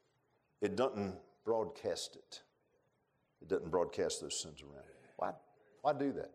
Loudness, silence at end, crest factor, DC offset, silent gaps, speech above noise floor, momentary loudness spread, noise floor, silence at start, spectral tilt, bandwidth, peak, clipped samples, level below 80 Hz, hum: -39 LUFS; 0 s; 20 dB; under 0.1%; none; 41 dB; 19 LU; -79 dBFS; 0.6 s; -4 dB/octave; 14.5 kHz; -20 dBFS; under 0.1%; -72 dBFS; none